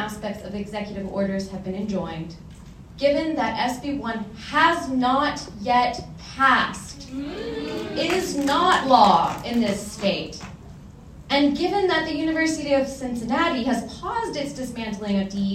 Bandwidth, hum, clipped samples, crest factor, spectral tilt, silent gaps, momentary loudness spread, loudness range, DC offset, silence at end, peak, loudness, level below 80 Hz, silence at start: 16 kHz; none; under 0.1%; 22 dB; -4.5 dB/octave; none; 14 LU; 5 LU; under 0.1%; 0 s; -2 dBFS; -23 LUFS; -48 dBFS; 0 s